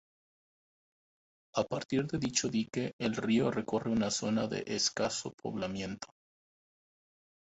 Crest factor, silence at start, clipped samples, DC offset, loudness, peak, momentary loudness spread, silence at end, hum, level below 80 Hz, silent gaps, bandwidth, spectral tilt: 20 dB; 1.55 s; under 0.1%; under 0.1%; -33 LUFS; -16 dBFS; 8 LU; 1.4 s; none; -64 dBFS; 2.93-2.99 s, 5.34-5.38 s; 8.2 kHz; -4 dB/octave